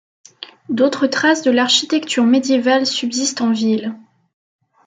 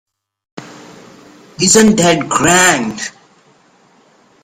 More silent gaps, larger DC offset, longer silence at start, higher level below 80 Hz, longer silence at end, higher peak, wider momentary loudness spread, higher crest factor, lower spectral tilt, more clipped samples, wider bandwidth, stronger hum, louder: neither; neither; second, 0.4 s vs 0.55 s; second, -70 dBFS vs -46 dBFS; second, 0.9 s vs 1.35 s; about the same, -2 dBFS vs 0 dBFS; second, 12 LU vs 19 LU; about the same, 14 dB vs 16 dB; about the same, -3 dB/octave vs -3 dB/octave; neither; second, 9.4 kHz vs 16.5 kHz; neither; second, -16 LUFS vs -10 LUFS